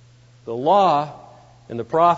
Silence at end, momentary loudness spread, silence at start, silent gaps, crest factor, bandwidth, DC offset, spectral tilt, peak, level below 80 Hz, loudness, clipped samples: 0 s; 17 LU; 0.45 s; none; 16 dB; 7.8 kHz; under 0.1%; -6.5 dB/octave; -4 dBFS; -62 dBFS; -19 LUFS; under 0.1%